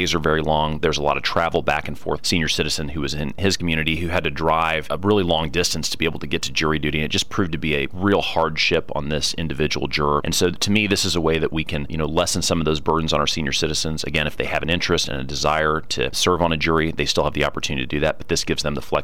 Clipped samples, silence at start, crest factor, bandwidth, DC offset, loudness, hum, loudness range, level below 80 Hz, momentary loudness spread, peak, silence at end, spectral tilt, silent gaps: under 0.1%; 0 s; 16 dB; 16.5 kHz; 3%; -21 LUFS; none; 1 LU; -38 dBFS; 5 LU; -6 dBFS; 0 s; -4 dB/octave; none